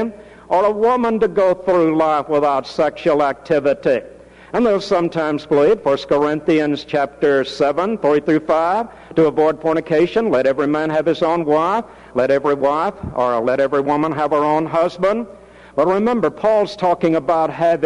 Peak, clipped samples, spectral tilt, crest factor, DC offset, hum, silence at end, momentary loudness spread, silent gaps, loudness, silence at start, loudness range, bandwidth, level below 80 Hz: -4 dBFS; under 0.1%; -6.5 dB/octave; 14 dB; under 0.1%; none; 0 s; 5 LU; none; -17 LUFS; 0 s; 1 LU; 10.5 kHz; -50 dBFS